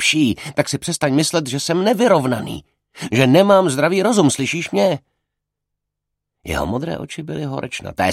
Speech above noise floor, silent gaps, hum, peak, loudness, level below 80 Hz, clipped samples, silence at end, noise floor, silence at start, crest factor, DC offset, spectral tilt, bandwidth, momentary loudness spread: 62 dB; none; none; 0 dBFS; -18 LUFS; -46 dBFS; under 0.1%; 0 s; -79 dBFS; 0 s; 18 dB; under 0.1%; -4.5 dB/octave; 16 kHz; 14 LU